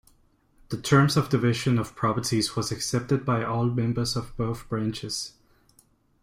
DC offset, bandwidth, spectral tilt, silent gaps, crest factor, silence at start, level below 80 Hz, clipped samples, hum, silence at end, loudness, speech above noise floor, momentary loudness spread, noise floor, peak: under 0.1%; 15.5 kHz; -5.5 dB/octave; none; 20 dB; 0.7 s; -52 dBFS; under 0.1%; none; 0.95 s; -26 LUFS; 37 dB; 10 LU; -62 dBFS; -6 dBFS